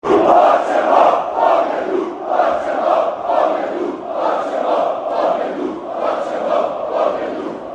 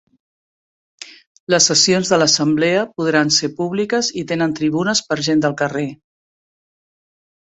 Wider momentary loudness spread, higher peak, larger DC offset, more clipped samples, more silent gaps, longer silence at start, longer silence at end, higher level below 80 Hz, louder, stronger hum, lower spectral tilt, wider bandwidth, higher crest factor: about the same, 10 LU vs 12 LU; about the same, 0 dBFS vs 0 dBFS; neither; neither; second, none vs 1.26-1.47 s; second, 0.05 s vs 1 s; second, 0 s vs 1.6 s; about the same, -58 dBFS vs -60 dBFS; about the same, -17 LUFS vs -16 LUFS; neither; first, -5.5 dB/octave vs -3 dB/octave; about the same, 9 kHz vs 8.4 kHz; about the same, 16 dB vs 18 dB